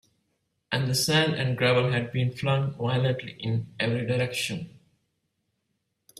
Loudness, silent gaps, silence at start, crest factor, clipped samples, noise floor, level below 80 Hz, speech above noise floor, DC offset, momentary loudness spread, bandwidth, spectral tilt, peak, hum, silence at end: -26 LUFS; none; 0.7 s; 20 dB; under 0.1%; -78 dBFS; -62 dBFS; 52 dB; under 0.1%; 9 LU; 14.5 kHz; -5 dB/octave; -8 dBFS; none; 1.5 s